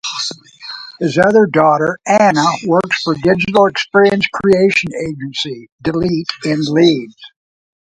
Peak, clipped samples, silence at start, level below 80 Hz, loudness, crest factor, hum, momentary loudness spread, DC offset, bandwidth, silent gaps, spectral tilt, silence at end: 0 dBFS; under 0.1%; 0.05 s; -50 dBFS; -14 LUFS; 14 dB; none; 12 LU; under 0.1%; 10.5 kHz; 5.72-5.78 s; -5 dB/octave; 0.65 s